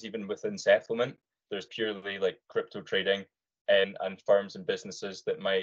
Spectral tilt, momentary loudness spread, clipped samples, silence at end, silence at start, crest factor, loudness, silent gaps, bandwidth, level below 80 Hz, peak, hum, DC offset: -4 dB/octave; 11 LU; under 0.1%; 0 s; 0 s; 20 dB; -30 LUFS; 3.61-3.65 s; 7.8 kHz; -80 dBFS; -10 dBFS; none; under 0.1%